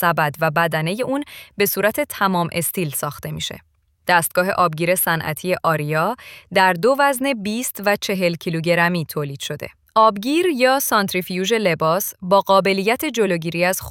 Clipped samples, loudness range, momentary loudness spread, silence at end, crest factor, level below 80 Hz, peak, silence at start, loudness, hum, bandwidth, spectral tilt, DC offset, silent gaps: under 0.1%; 3 LU; 10 LU; 0 s; 18 dB; -56 dBFS; -2 dBFS; 0 s; -19 LUFS; none; 18 kHz; -4 dB/octave; under 0.1%; none